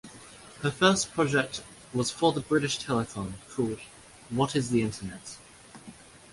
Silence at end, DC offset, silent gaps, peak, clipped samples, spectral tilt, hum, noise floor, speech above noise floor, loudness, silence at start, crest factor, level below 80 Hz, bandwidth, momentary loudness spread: 0.15 s; under 0.1%; none; -6 dBFS; under 0.1%; -4.5 dB/octave; none; -50 dBFS; 22 dB; -28 LUFS; 0.05 s; 22 dB; -58 dBFS; 11.5 kHz; 23 LU